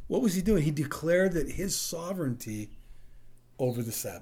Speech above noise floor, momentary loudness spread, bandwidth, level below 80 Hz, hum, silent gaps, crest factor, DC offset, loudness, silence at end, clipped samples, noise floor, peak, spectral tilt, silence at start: 20 dB; 10 LU; over 20 kHz; -46 dBFS; none; none; 16 dB; under 0.1%; -30 LUFS; 0 s; under 0.1%; -49 dBFS; -14 dBFS; -5 dB/octave; 0 s